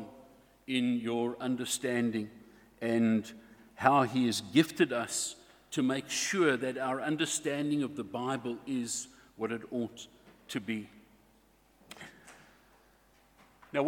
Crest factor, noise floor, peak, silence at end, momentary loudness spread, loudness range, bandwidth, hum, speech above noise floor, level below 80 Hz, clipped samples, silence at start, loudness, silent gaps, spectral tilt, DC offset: 26 dB; -65 dBFS; -8 dBFS; 0 s; 20 LU; 13 LU; 18 kHz; none; 34 dB; -72 dBFS; under 0.1%; 0 s; -32 LUFS; none; -4 dB/octave; under 0.1%